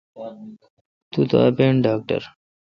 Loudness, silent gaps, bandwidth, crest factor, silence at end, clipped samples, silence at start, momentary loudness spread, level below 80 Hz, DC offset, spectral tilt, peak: -20 LUFS; 0.70-1.11 s; 6.4 kHz; 18 dB; 0.5 s; under 0.1%; 0.15 s; 21 LU; -58 dBFS; under 0.1%; -9 dB/octave; -2 dBFS